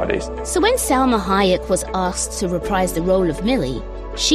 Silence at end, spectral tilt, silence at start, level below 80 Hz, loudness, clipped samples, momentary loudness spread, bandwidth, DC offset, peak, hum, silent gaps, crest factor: 0 s; -4 dB/octave; 0 s; -32 dBFS; -19 LUFS; under 0.1%; 6 LU; 15 kHz; under 0.1%; -4 dBFS; none; none; 16 dB